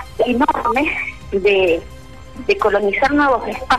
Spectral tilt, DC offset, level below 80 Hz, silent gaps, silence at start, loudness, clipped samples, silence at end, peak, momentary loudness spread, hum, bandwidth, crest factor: -5 dB/octave; 0.9%; -40 dBFS; none; 0 s; -17 LUFS; under 0.1%; 0 s; -4 dBFS; 8 LU; none; 13.5 kHz; 12 dB